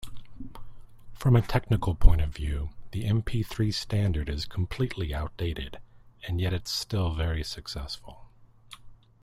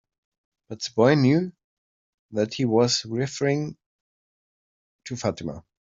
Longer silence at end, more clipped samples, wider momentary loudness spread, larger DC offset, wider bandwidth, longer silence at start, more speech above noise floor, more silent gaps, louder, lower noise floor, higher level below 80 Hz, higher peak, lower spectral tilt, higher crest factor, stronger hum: about the same, 0.3 s vs 0.3 s; neither; first, 22 LU vs 16 LU; neither; first, 14.5 kHz vs 7.8 kHz; second, 0 s vs 0.7 s; second, 26 dB vs over 67 dB; second, none vs 1.64-2.29 s, 3.86-4.99 s; second, -29 LUFS vs -23 LUFS; second, -52 dBFS vs under -90 dBFS; first, -32 dBFS vs -62 dBFS; about the same, -2 dBFS vs -4 dBFS; about the same, -6 dB/octave vs -5.5 dB/octave; about the same, 24 dB vs 22 dB; neither